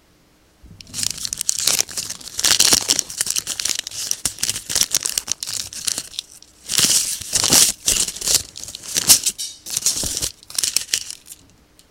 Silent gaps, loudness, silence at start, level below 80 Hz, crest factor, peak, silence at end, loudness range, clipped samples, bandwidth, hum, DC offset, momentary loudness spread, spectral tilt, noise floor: none; -18 LUFS; 0.65 s; -48 dBFS; 22 dB; 0 dBFS; 0.55 s; 5 LU; under 0.1%; over 20 kHz; none; under 0.1%; 13 LU; 0.5 dB/octave; -55 dBFS